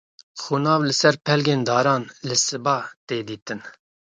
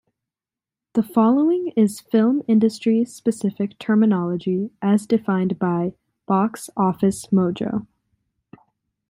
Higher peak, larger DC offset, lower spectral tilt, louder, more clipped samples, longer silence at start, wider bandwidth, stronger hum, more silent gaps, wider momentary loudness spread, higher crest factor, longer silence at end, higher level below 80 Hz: about the same, -2 dBFS vs -4 dBFS; neither; second, -4 dB/octave vs -7.5 dB/octave; about the same, -21 LUFS vs -21 LUFS; neither; second, 0.35 s vs 0.95 s; second, 9.6 kHz vs 15.5 kHz; neither; first, 2.96-3.07 s, 3.42-3.46 s vs none; first, 15 LU vs 7 LU; about the same, 20 dB vs 16 dB; second, 0.45 s vs 1.3 s; about the same, -66 dBFS vs -62 dBFS